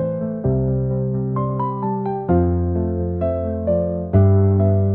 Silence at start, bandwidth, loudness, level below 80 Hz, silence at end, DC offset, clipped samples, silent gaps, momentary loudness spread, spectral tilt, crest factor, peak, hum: 0 s; 2.2 kHz; -20 LUFS; -38 dBFS; 0 s; 0.2%; under 0.1%; none; 7 LU; -14.5 dB/octave; 14 dB; -4 dBFS; none